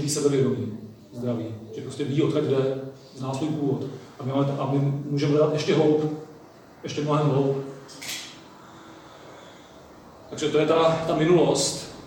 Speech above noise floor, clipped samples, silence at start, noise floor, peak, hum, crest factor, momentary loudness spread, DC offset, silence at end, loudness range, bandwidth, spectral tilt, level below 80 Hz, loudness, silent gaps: 24 dB; under 0.1%; 0 s; -48 dBFS; -8 dBFS; none; 16 dB; 21 LU; under 0.1%; 0 s; 5 LU; 19 kHz; -5.5 dB/octave; -62 dBFS; -24 LUFS; none